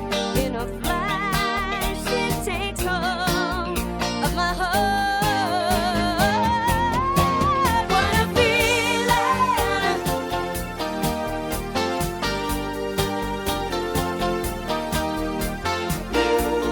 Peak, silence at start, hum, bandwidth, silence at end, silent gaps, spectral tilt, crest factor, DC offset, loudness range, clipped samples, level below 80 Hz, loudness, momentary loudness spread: -6 dBFS; 0 s; none; over 20 kHz; 0 s; none; -4 dB/octave; 16 dB; under 0.1%; 6 LU; under 0.1%; -36 dBFS; -22 LUFS; 7 LU